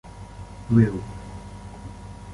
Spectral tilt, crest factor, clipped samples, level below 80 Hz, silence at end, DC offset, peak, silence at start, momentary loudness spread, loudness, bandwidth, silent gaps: -9 dB/octave; 22 dB; under 0.1%; -42 dBFS; 0 s; under 0.1%; -4 dBFS; 0.05 s; 21 LU; -22 LUFS; 11.5 kHz; none